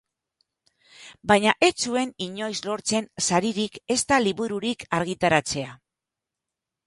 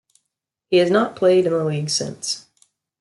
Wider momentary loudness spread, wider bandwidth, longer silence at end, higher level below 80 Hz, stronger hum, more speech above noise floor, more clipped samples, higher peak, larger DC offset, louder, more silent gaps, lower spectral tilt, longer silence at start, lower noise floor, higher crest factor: about the same, 10 LU vs 10 LU; about the same, 11.5 kHz vs 12 kHz; first, 1.1 s vs 0.6 s; first, -58 dBFS vs -66 dBFS; neither; about the same, 63 dB vs 61 dB; neither; first, -2 dBFS vs -6 dBFS; neither; second, -24 LUFS vs -19 LUFS; neither; about the same, -3.5 dB/octave vs -4.5 dB/octave; first, 1 s vs 0.7 s; first, -87 dBFS vs -80 dBFS; first, 24 dB vs 16 dB